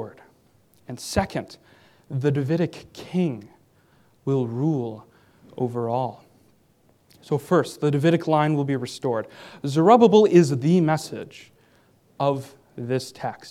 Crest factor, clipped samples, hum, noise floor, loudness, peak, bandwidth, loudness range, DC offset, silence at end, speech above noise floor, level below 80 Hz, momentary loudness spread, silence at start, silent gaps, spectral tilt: 22 dB; under 0.1%; none; -61 dBFS; -22 LUFS; -2 dBFS; 15 kHz; 9 LU; under 0.1%; 0 s; 39 dB; -56 dBFS; 20 LU; 0 s; none; -7 dB/octave